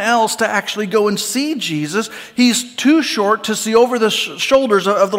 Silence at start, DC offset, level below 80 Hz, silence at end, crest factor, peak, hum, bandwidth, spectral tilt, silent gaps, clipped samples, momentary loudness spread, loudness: 0 s; under 0.1%; -58 dBFS; 0 s; 14 dB; -2 dBFS; none; 16.5 kHz; -3 dB/octave; none; under 0.1%; 6 LU; -15 LUFS